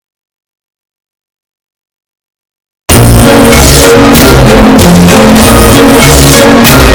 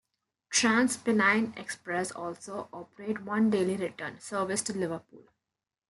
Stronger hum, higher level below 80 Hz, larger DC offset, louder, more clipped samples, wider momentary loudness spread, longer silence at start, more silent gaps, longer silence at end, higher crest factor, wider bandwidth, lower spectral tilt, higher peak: neither; first, -14 dBFS vs -76 dBFS; neither; first, -1 LUFS vs -29 LUFS; first, 40% vs under 0.1%; second, 1 LU vs 15 LU; first, 2.9 s vs 0.5 s; neither; second, 0 s vs 0.7 s; second, 4 dB vs 20 dB; first, over 20 kHz vs 12 kHz; about the same, -4.5 dB/octave vs -3.5 dB/octave; first, 0 dBFS vs -12 dBFS